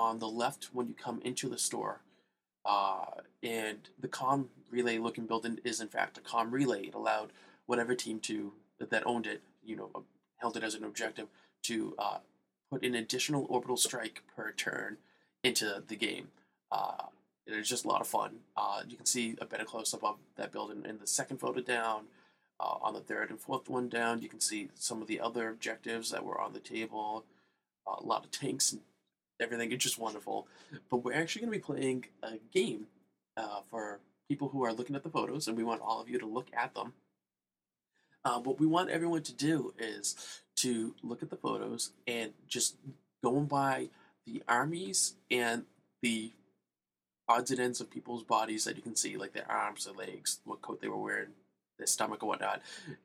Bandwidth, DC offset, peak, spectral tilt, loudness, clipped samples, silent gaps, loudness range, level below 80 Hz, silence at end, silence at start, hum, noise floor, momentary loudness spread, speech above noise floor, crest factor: 16 kHz; under 0.1%; -12 dBFS; -3 dB/octave; -36 LUFS; under 0.1%; none; 4 LU; -84 dBFS; 0.1 s; 0 s; none; under -90 dBFS; 12 LU; over 54 dB; 24 dB